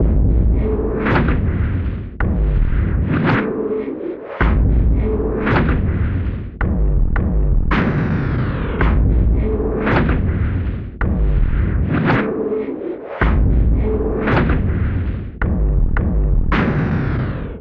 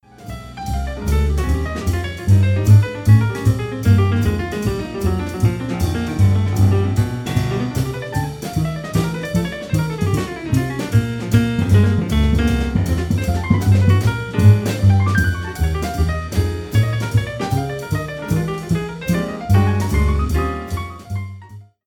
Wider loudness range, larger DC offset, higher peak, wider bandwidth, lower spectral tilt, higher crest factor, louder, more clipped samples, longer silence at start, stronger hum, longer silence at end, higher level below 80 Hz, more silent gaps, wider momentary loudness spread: second, 1 LU vs 5 LU; neither; about the same, -2 dBFS vs 0 dBFS; second, 4.9 kHz vs 15.5 kHz; first, -10 dB/octave vs -7 dB/octave; about the same, 14 dB vs 16 dB; about the same, -19 LUFS vs -18 LUFS; neither; second, 0 s vs 0.2 s; neither; second, 0 s vs 0.25 s; first, -18 dBFS vs -28 dBFS; neither; second, 6 LU vs 9 LU